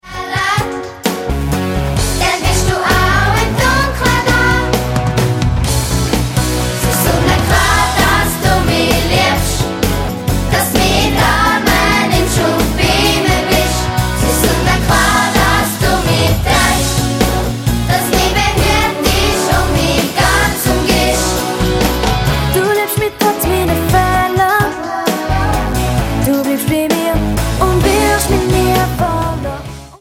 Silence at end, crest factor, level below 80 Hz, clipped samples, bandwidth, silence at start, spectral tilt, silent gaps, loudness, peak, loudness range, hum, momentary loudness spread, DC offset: 0.05 s; 12 dB; -22 dBFS; under 0.1%; 16.5 kHz; 0.05 s; -4.5 dB/octave; none; -13 LUFS; 0 dBFS; 2 LU; none; 5 LU; under 0.1%